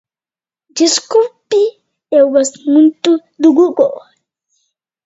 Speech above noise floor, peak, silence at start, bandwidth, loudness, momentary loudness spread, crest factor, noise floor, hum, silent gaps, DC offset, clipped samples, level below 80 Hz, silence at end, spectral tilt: over 79 dB; 0 dBFS; 0.75 s; 8 kHz; -12 LUFS; 6 LU; 14 dB; under -90 dBFS; none; none; under 0.1%; under 0.1%; -64 dBFS; 1.05 s; -2.5 dB/octave